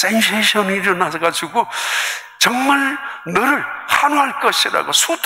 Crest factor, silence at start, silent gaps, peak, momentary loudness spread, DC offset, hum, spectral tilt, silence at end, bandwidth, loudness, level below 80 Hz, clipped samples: 16 dB; 0 s; none; -2 dBFS; 6 LU; under 0.1%; none; -2 dB/octave; 0 s; 16.5 kHz; -16 LUFS; -62 dBFS; under 0.1%